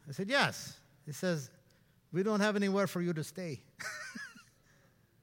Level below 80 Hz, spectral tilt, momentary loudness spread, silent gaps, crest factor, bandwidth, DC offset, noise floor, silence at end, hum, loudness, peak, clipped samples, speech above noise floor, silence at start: -76 dBFS; -5 dB/octave; 17 LU; none; 24 dB; 17 kHz; under 0.1%; -67 dBFS; 0.8 s; none; -35 LUFS; -12 dBFS; under 0.1%; 34 dB; 0.05 s